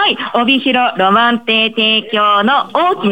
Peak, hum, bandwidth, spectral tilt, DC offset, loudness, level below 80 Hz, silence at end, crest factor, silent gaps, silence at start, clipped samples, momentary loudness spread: 0 dBFS; none; 17 kHz; -5.5 dB/octave; 0.4%; -12 LUFS; -62 dBFS; 0 s; 12 dB; none; 0 s; under 0.1%; 3 LU